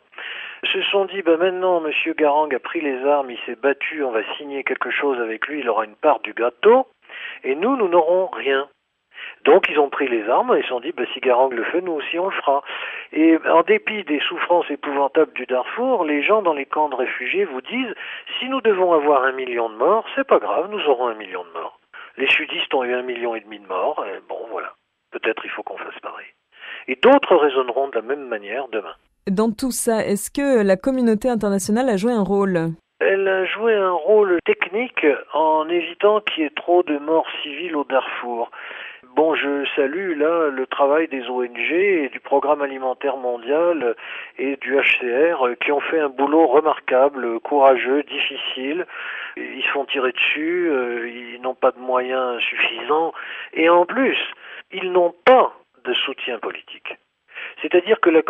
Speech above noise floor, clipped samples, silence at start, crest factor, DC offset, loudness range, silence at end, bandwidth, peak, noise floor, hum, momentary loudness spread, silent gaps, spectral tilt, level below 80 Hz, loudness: 23 dB; under 0.1%; 0.2 s; 18 dB; under 0.1%; 4 LU; 0 s; 13 kHz; -2 dBFS; -42 dBFS; none; 14 LU; none; -4.5 dB/octave; -62 dBFS; -20 LUFS